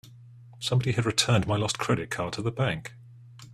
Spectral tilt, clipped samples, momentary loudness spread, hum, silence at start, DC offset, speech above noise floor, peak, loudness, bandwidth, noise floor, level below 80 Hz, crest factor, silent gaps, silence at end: -4.5 dB/octave; under 0.1%; 9 LU; none; 0.05 s; under 0.1%; 23 dB; -6 dBFS; -27 LUFS; 13.5 kHz; -49 dBFS; -56 dBFS; 22 dB; none; 0 s